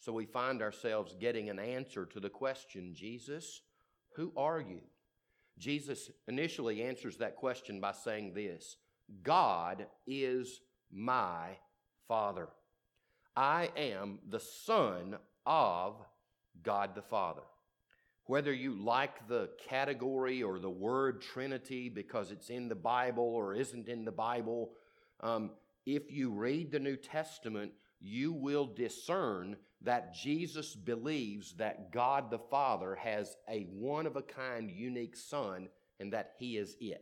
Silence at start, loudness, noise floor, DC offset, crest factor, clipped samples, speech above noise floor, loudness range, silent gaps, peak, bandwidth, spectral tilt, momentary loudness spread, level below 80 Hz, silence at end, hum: 0 s; -38 LUFS; -80 dBFS; under 0.1%; 22 dB; under 0.1%; 42 dB; 5 LU; none; -18 dBFS; 17.5 kHz; -5 dB/octave; 13 LU; -80 dBFS; 0 s; none